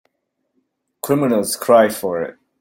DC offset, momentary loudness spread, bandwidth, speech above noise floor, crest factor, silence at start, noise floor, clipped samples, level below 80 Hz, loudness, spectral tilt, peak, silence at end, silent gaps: under 0.1%; 14 LU; 16.5 kHz; 57 dB; 18 dB; 1.05 s; -73 dBFS; under 0.1%; -62 dBFS; -17 LUFS; -4.5 dB/octave; -2 dBFS; 0.3 s; none